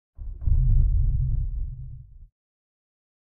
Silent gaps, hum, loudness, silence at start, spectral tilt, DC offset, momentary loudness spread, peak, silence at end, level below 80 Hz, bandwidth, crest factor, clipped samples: none; none; -27 LUFS; 0.2 s; -14 dB/octave; under 0.1%; 19 LU; -8 dBFS; 1 s; -26 dBFS; 0.7 kHz; 16 dB; under 0.1%